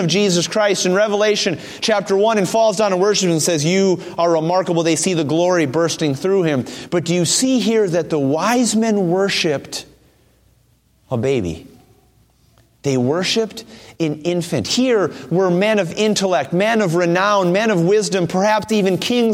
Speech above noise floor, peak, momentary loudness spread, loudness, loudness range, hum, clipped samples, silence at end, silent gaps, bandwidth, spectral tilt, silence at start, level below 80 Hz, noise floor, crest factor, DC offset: 40 dB; -4 dBFS; 6 LU; -17 LUFS; 6 LU; none; under 0.1%; 0 s; none; 16 kHz; -4.5 dB/octave; 0 s; -56 dBFS; -57 dBFS; 14 dB; under 0.1%